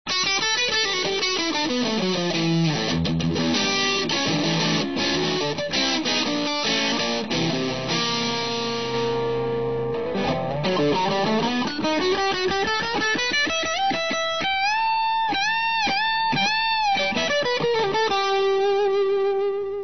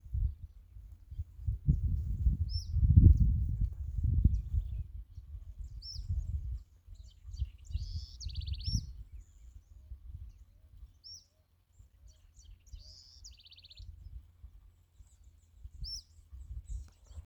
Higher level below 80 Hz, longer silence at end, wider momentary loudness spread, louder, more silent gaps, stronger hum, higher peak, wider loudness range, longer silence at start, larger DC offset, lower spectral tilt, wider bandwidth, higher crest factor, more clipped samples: second, -52 dBFS vs -38 dBFS; about the same, 0 s vs 0.05 s; second, 4 LU vs 23 LU; first, -22 LUFS vs -34 LUFS; neither; neither; about the same, -10 dBFS vs -8 dBFS; second, 3 LU vs 24 LU; about the same, 0.05 s vs 0.05 s; first, 0.7% vs under 0.1%; second, -3.5 dB/octave vs -7 dB/octave; second, 6.4 kHz vs 7.6 kHz; second, 14 dB vs 26 dB; neither